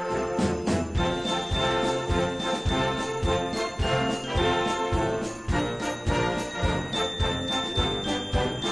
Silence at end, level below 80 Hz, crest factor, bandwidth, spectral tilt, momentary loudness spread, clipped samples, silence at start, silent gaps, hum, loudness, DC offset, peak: 0 s; -36 dBFS; 16 dB; 11 kHz; -5 dB/octave; 3 LU; under 0.1%; 0 s; none; none; -27 LUFS; under 0.1%; -10 dBFS